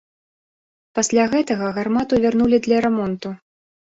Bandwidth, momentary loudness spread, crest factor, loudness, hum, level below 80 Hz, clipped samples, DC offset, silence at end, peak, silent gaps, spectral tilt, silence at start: 8 kHz; 12 LU; 16 dB; -19 LUFS; none; -52 dBFS; under 0.1%; under 0.1%; 0.45 s; -6 dBFS; none; -5 dB/octave; 0.95 s